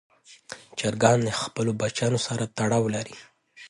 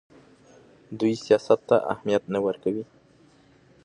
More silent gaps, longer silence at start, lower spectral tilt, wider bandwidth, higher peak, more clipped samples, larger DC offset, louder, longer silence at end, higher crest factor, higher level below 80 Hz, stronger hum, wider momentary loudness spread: neither; second, 0.3 s vs 0.9 s; second, -5 dB/octave vs -6.5 dB/octave; about the same, 11.5 kHz vs 10.5 kHz; about the same, -4 dBFS vs -6 dBFS; neither; neither; about the same, -25 LUFS vs -24 LUFS; second, 0 s vs 1 s; about the same, 22 dB vs 22 dB; first, -60 dBFS vs -66 dBFS; neither; first, 18 LU vs 12 LU